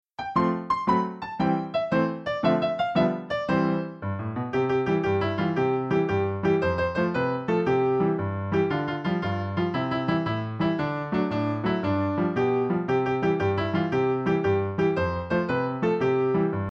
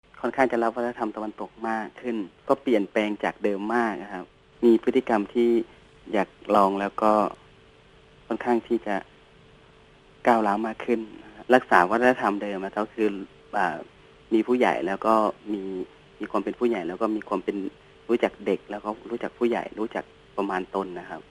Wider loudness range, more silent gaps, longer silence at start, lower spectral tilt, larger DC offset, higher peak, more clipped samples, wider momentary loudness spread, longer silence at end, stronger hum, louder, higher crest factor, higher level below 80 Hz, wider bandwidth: second, 2 LU vs 5 LU; neither; about the same, 0.2 s vs 0.15 s; first, -8.5 dB/octave vs -6.5 dB/octave; neither; second, -10 dBFS vs 0 dBFS; neither; second, 4 LU vs 13 LU; about the same, 0 s vs 0.1 s; neither; about the same, -25 LUFS vs -25 LUFS; second, 16 dB vs 26 dB; first, -52 dBFS vs -62 dBFS; second, 7.2 kHz vs 12.5 kHz